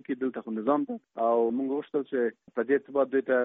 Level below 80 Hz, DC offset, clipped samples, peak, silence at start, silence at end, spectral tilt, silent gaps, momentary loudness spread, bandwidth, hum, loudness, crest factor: -76 dBFS; under 0.1%; under 0.1%; -12 dBFS; 0.1 s; 0 s; -5 dB/octave; none; 6 LU; 3.9 kHz; none; -29 LUFS; 16 dB